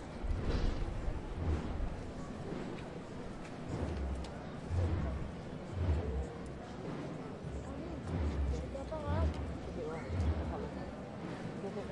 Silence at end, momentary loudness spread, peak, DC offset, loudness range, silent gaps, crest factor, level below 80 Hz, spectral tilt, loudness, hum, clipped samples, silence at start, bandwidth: 0 s; 9 LU; -22 dBFS; under 0.1%; 3 LU; none; 16 dB; -42 dBFS; -7.5 dB/octave; -40 LUFS; none; under 0.1%; 0 s; 10.5 kHz